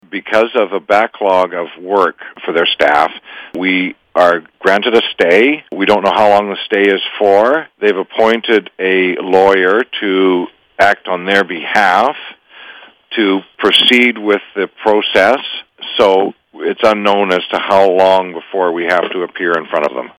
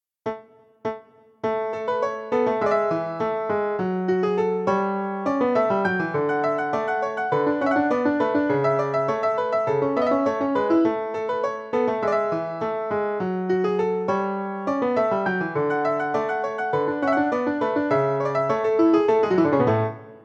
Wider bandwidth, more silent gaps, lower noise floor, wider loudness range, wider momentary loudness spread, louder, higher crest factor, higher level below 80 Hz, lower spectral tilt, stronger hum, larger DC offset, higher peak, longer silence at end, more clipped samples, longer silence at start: first, 16.5 kHz vs 7.6 kHz; neither; second, -37 dBFS vs -47 dBFS; about the same, 2 LU vs 3 LU; about the same, 9 LU vs 7 LU; first, -12 LUFS vs -23 LUFS; about the same, 12 dB vs 16 dB; first, -56 dBFS vs -66 dBFS; second, -4.5 dB/octave vs -7.5 dB/octave; neither; neither; first, 0 dBFS vs -6 dBFS; about the same, 0.15 s vs 0.05 s; neither; second, 0.1 s vs 0.25 s